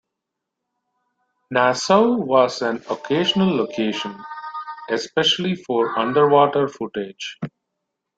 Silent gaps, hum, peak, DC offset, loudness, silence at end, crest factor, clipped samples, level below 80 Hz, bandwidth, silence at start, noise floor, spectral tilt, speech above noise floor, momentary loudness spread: none; none; -2 dBFS; under 0.1%; -19 LUFS; 0.7 s; 20 dB; under 0.1%; -64 dBFS; 9 kHz; 1.5 s; -82 dBFS; -4.5 dB/octave; 62 dB; 15 LU